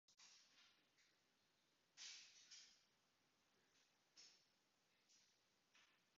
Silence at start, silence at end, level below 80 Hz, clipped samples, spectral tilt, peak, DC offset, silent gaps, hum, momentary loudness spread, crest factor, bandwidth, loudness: 0.1 s; 0 s; under -90 dBFS; under 0.1%; 2 dB/octave; -48 dBFS; under 0.1%; none; none; 10 LU; 24 dB; 7.4 kHz; -63 LUFS